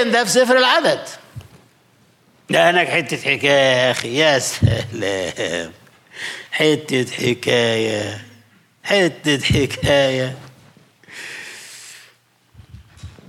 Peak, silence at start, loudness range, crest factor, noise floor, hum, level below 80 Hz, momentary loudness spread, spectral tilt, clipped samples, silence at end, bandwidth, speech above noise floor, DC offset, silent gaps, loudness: -2 dBFS; 0 s; 5 LU; 16 dB; -55 dBFS; none; -46 dBFS; 20 LU; -4 dB/octave; under 0.1%; 0.2 s; 16 kHz; 38 dB; under 0.1%; none; -17 LUFS